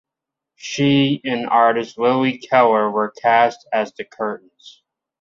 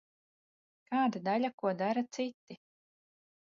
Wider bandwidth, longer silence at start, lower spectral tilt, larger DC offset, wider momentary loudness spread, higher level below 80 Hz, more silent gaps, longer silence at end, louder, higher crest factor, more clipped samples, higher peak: about the same, 7.6 kHz vs 7.2 kHz; second, 0.65 s vs 0.9 s; about the same, -5.5 dB/octave vs -4.5 dB/octave; neither; second, 11 LU vs 22 LU; first, -66 dBFS vs -86 dBFS; second, none vs 1.54-1.58 s, 2.34-2.47 s; second, 0.55 s vs 0.9 s; first, -18 LUFS vs -34 LUFS; about the same, 16 dB vs 16 dB; neither; first, -2 dBFS vs -20 dBFS